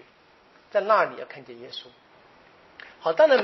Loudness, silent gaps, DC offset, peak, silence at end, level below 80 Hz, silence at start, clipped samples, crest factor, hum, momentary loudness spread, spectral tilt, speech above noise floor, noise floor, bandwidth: -23 LUFS; none; under 0.1%; -6 dBFS; 0 s; -76 dBFS; 0.75 s; under 0.1%; 20 dB; none; 22 LU; -1 dB/octave; 34 dB; -57 dBFS; 6 kHz